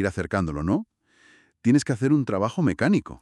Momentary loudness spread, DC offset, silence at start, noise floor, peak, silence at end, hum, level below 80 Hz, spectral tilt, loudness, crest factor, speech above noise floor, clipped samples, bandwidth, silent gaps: 6 LU; under 0.1%; 0 s; -58 dBFS; -8 dBFS; 0.05 s; none; -48 dBFS; -7 dB/octave; -24 LUFS; 16 dB; 35 dB; under 0.1%; 11.5 kHz; none